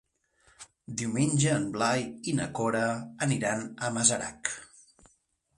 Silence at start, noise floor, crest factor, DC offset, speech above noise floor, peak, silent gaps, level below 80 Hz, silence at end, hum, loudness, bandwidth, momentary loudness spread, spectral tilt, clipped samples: 0.6 s; -70 dBFS; 24 dB; under 0.1%; 42 dB; -6 dBFS; none; -62 dBFS; 0.95 s; none; -29 LUFS; 11.5 kHz; 10 LU; -4 dB/octave; under 0.1%